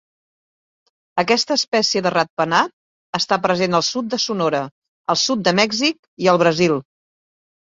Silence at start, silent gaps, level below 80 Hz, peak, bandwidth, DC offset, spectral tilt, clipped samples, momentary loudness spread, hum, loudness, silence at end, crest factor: 1.15 s; 1.68-1.72 s, 2.30-2.37 s, 2.73-3.13 s, 4.71-4.82 s, 4.88-5.04 s, 5.99-6.17 s; -62 dBFS; -2 dBFS; 7.8 kHz; under 0.1%; -3.5 dB/octave; under 0.1%; 9 LU; none; -18 LUFS; 0.95 s; 18 dB